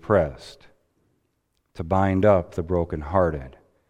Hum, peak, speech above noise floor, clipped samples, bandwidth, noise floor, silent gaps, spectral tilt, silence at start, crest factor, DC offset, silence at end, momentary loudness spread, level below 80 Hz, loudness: none; -4 dBFS; 50 dB; under 0.1%; 9.4 kHz; -72 dBFS; none; -8.5 dB/octave; 0.05 s; 20 dB; under 0.1%; 0.4 s; 18 LU; -42 dBFS; -23 LUFS